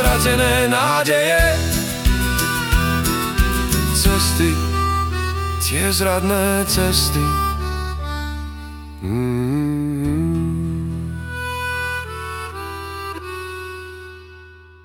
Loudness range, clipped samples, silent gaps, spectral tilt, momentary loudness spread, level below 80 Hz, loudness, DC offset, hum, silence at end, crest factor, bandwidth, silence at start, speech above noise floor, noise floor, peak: 9 LU; under 0.1%; none; -4 dB/octave; 14 LU; -26 dBFS; -19 LUFS; under 0.1%; none; 0.2 s; 20 dB; 18 kHz; 0 s; 26 dB; -42 dBFS; 0 dBFS